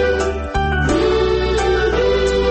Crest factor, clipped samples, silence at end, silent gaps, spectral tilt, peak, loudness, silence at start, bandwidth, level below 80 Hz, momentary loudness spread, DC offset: 10 dB; under 0.1%; 0 s; none; -5.5 dB/octave; -6 dBFS; -17 LUFS; 0 s; 8.8 kHz; -24 dBFS; 4 LU; under 0.1%